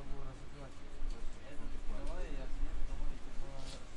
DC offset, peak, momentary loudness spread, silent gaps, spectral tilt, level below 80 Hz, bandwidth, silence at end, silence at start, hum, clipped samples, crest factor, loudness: under 0.1%; -22 dBFS; 6 LU; none; -5.5 dB/octave; -40 dBFS; 9 kHz; 0 s; 0 s; none; under 0.1%; 12 dB; -48 LUFS